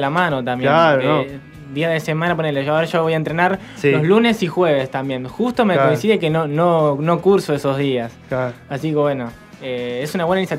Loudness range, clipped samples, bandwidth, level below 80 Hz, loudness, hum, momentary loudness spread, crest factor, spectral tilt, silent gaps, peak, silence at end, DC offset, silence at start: 3 LU; under 0.1%; 15.5 kHz; -54 dBFS; -18 LUFS; none; 11 LU; 16 dB; -6.5 dB/octave; none; 0 dBFS; 0 s; under 0.1%; 0 s